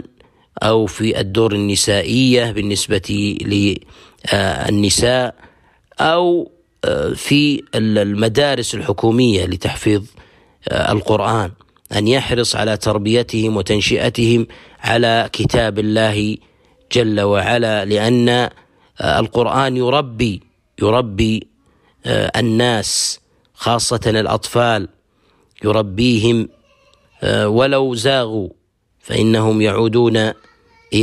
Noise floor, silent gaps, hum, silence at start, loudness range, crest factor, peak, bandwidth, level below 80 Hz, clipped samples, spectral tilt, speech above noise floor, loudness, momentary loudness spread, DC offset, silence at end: -57 dBFS; none; none; 0.55 s; 2 LU; 14 dB; -2 dBFS; 15.5 kHz; -40 dBFS; under 0.1%; -5 dB/octave; 42 dB; -16 LUFS; 9 LU; under 0.1%; 0 s